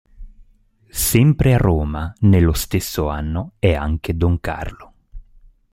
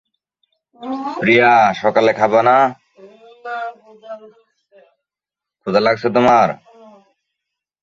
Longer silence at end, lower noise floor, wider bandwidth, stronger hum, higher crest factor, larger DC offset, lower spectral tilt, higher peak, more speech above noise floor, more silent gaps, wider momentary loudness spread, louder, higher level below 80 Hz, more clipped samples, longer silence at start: second, 0.5 s vs 1.3 s; second, -54 dBFS vs -87 dBFS; first, 16.5 kHz vs 7.6 kHz; neither; about the same, 18 dB vs 16 dB; neither; about the same, -6 dB/octave vs -6 dB/octave; about the same, 0 dBFS vs 0 dBFS; second, 37 dB vs 73 dB; neither; second, 11 LU vs 23 LU; second, -18 LUFS vs -14 LUFS; first, -30 dBFS vs -60 dBFS; neither; second, 0.2 s vs 0.8 s